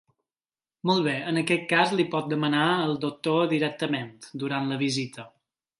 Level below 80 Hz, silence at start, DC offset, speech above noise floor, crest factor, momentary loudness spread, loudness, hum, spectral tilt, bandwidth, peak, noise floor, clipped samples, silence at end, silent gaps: -72 dBFS; 0.85 s; under 0.1%; over 64 dB; 20 dB; 9 LU; -26 LUFS; none; -5.5 dB/octave; 11.5 kHz; -6 dBFS; under -90 dBFS; under 0.1%; 0.5 s; none